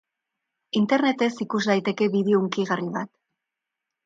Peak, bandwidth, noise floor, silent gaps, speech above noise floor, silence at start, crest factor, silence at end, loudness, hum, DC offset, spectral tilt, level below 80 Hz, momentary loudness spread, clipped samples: -6 dBFS; 7.8 kHz; -85 dBFS; none; 62 dB; 0.75 s; 18 dB; 1 s; -24 LUFS; none; under 0.1%; -6 dB/octave; -72 dBFS; 9 LU; under 0.1%